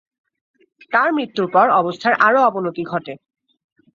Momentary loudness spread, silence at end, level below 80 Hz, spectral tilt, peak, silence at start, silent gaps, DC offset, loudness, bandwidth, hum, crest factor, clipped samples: 12 LU; 0.8 s; -68 dBFS; -6.5 dB/octave; -2 dBFS; 0.9 s; none; under 0.1%; -17 LUFS; 7.4 kHz; none; 18 dB; under 0.1%